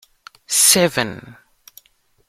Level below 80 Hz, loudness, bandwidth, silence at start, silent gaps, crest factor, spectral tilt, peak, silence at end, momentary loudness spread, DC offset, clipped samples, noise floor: -58 dBFS; -14 LUFS; 16 kHz; 0.5 s; none; 20 dB; -1.5 dB/octave; 0 dBFS; 0.95 s; 16 LU; under 0.1%; under 0.1%; -59 dBFS